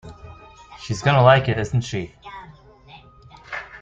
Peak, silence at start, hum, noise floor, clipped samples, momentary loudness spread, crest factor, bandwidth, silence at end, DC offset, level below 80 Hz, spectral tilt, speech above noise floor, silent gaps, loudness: -2 dBFS; 0.05 s; none; -47 dBFS; under 0.1%; 25 LU; 20 dB; 7.8 kHz; 0 s; under 0.1%; -48 dBFS; -6 dB/octave; 29 dB; none; -19 LUFS